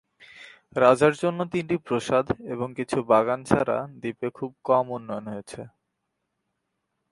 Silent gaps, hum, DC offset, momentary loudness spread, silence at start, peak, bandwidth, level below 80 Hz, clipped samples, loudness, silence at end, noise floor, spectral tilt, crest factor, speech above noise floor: none; none; under 0.1%; 14 LU; 0.35 s; -2 dBFS; 11.5 kHz; -58 dBFS; under 0.1%; -25 LUFS; 1.45 s; -79 dBFS; -6 dB/octave; 22 dB; 55 dB